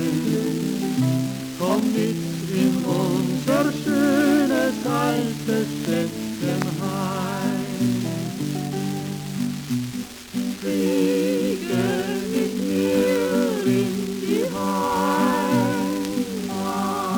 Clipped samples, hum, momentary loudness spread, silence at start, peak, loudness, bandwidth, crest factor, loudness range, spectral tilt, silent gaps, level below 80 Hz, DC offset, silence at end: under 0.1%; none; 7 LU; 0 s; -6 dBFS; -23 LUFS; over 20 kHz; 16 dB; 5 LU; -5.5 dB/octave; none; -56 dBFS; under 0.1%; 0 s